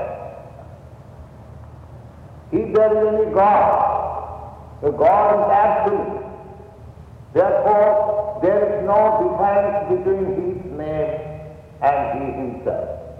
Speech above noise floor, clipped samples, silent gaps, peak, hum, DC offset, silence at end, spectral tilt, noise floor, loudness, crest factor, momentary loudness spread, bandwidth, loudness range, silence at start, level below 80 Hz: 23 dB; under 0.1%; none; -2 dBFS; none; under 0.1%; 0 s; -9 dB/octave; -40 dBFS; -18 LUFS; 16 dB; 19 LU; 5 kHz; 5 LU; 0 s; -44 dBFS